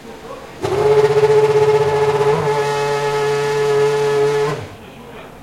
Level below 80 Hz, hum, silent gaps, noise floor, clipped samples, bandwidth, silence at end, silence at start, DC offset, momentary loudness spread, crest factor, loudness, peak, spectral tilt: -50 dBFS; none; none; -35 dBFS; under 0.1%; 13.5 kHz; 0 s; 0 s; 0.2%; 20 LU; 14 dB; -15 LUFS; -2 dBFS; -5 dB/octave